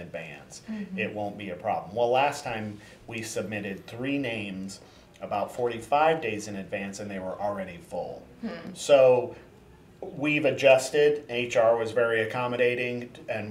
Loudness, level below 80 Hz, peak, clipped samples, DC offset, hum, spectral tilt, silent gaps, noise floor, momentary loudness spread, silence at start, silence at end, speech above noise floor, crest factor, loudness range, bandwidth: -27 LUFS; -62 dBFS; -6 dBFS; under 0.1%; under 0.1%; none; -4.5 dB/octave; none; -53 dBFS; 18 LU; 0 s; 0 s; 26 dB; 20 dB; 7 LU; 15.5 kHz